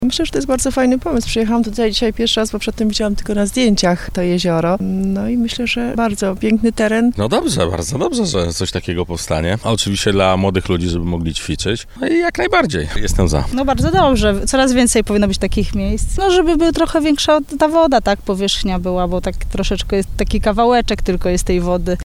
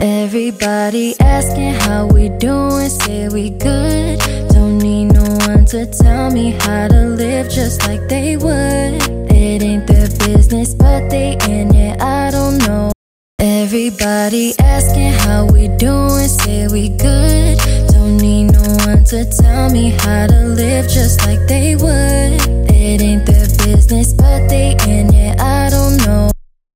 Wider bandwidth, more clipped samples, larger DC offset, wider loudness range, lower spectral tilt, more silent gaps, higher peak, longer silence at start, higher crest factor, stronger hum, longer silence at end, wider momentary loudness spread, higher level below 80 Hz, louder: about the same, 16 kHz vs 16.5 kHz; neither; neither; about the same, 3 LU vs 3 LU; about the same, -5 dB/octave vs -5.5 dB/octave; second, none vs 12.95-13.38 s; about the same, 0 dBFS vs 0 dBFS; about the same, 0 s vs 0 s; about the same, 14 dB vs 10 dB; neither; second, 0 s vs 0.35 s; about the same, 7 LU vs 5 LU; second, -26 dBFS vs -14 dBFS; second, -16 LUFS vs -12 LUFS